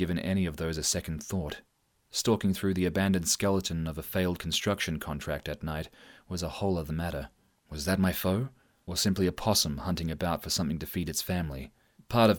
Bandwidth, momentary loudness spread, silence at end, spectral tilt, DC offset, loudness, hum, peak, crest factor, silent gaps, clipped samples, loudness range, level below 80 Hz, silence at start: over 20 kHz; 12 LU; 0 s; -4.5 dB/octave; under 0.1%; -30 LUFS; none; -10 dBFS; 20 dB; none; under 0.1%; 4 LU; -48 dBFS; 0 s